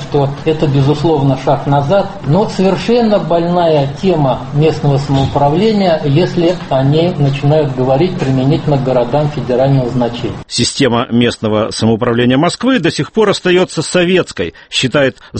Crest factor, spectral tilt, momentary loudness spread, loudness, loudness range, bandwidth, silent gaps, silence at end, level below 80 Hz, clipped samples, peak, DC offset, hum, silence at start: 12 dB; -6 dB/octave; 3 LU; -12 LUFS; 1 LU; 8.8 kHz; none; 0 s; -38 dBFS; under 0.1%; 0 dBFS; under 0.1%; none; 0 s